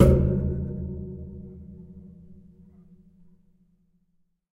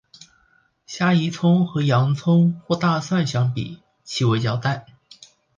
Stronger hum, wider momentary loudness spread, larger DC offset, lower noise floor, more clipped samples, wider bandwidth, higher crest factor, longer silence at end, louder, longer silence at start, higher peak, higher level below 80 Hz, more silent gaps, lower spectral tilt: neither; first, 25 LU vs 12 LU; neither; first, -69 dBFS vs -61 dBFS; neither; first, 13 kHz vs 7.4 kHz; first, 24 dB vs 16 dB; first, 2.2 s vs 0.75 s; second, -27 LUFS vs -21 LUFS; second, 0 s vs 0.9 s; about the same, -4 dBFS vs -6 dBFS; first, -34 dBFS vs -58 dBFS; neither; first, -9.5 dB/octave vs -6.5 dB/octave